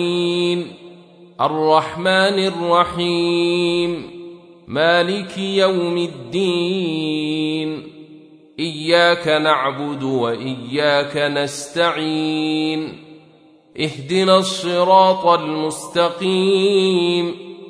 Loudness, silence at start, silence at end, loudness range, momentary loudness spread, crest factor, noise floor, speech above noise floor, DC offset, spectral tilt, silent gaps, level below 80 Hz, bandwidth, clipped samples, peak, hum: -18 LUFS; 0 s; 0 s; 4 LU; 10 LU; 18 dB; -49 dBFS; 32 dB; under 0.1%; -5 dB/octave; none; -60 dBFS; 11 kHz; under 0.1%; -2 dBFS; none